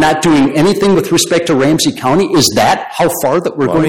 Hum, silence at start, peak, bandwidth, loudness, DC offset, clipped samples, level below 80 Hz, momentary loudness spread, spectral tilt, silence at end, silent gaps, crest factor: none; 0 s; 0 dBFS; 17 kHz; -11 LUFS; under 0.1%; under 0.1%; -42 dBFS; 4 LU; -4.5 dB/octave; 0 s; none; 10 dB